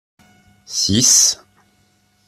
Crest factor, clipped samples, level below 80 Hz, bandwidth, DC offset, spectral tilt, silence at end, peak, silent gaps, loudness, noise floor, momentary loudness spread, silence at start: 18 dB; under 0.1%; -52 dBFS; 16 kHz; under 0.1%; -1.5 dB/octave; 0.95 s; 0 dBFS; none; -13 LUFS; -59 dBFS; 16 LU; 0.7 s